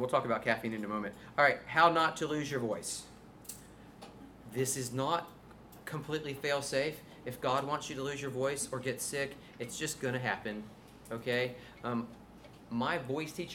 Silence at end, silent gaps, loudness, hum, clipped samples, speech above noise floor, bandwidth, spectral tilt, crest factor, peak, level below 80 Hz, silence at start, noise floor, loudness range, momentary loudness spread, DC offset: 0 s; none; -34 LUFS; none; under 0.1%; 20 dB; 18 kHz; -4 dB/octave; 24 dB; -10 dBFS; -66 dBFS; 0 s; -54 dBFS; 6 LU; 23 LU; under 0.1%